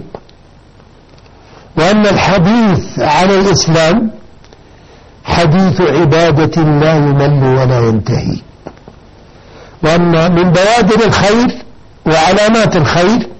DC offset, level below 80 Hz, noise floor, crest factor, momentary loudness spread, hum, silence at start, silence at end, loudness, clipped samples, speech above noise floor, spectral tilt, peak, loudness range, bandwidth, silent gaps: under 0.1%; -34 dBFS; -40 dBFS; 10 dB; 7 LU; none; 0 s; 0 s; -10 LUFS; under 0.1%; 31 dB; -6 dB/octave; 0 dBFS; 3 LU; 8.4 kHz; none